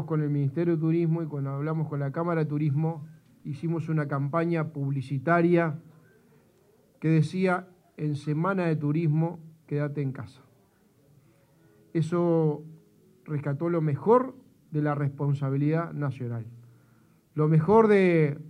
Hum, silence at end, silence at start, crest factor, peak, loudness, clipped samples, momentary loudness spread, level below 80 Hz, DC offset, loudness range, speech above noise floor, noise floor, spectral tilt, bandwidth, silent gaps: none; 0 s; 0 s; 20 dB; -6 dBFS; -27 LUFS; under 0.1%; 12 LU; -70 dBFS; under 0.1%; 4 LU; 37 dB; -63 dBFS; -9.5 dB/octave; 9.6 kHz; none